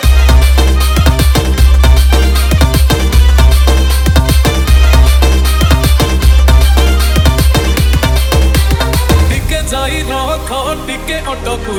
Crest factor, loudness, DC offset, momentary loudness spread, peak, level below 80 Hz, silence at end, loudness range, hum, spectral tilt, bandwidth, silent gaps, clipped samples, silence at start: 8 dB; -10 LUFS; under 0.1%; 8 LU; 0 dBFS; -10 dBFS; 0 s; 3 LU; none; -5 dB/octave; 17 kHz; none; 0.6%; 0 s